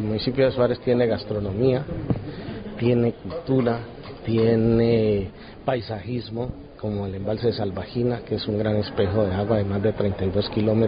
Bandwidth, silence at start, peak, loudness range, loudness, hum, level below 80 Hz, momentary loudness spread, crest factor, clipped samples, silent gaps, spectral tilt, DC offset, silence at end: 5.2 kHz; 0 s; -6 dBFS; 4 LU; -24 LUFS; none; -42 dBFS; 11 LU; 16 dB; under 0.1%; none; -12 dB/octave; under 0.1%; 0 s